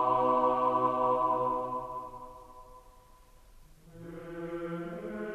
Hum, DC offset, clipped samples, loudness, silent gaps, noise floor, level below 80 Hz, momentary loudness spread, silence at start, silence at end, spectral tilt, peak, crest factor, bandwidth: none; under 0.1%; under 0.1%; -30 LUFS; none; -57 dBFS; -58 dBFS; 22 LU; 0 s; 0 s; -7.5 dB/octave; -16 dBFS; 18 dB; 13.5 kHz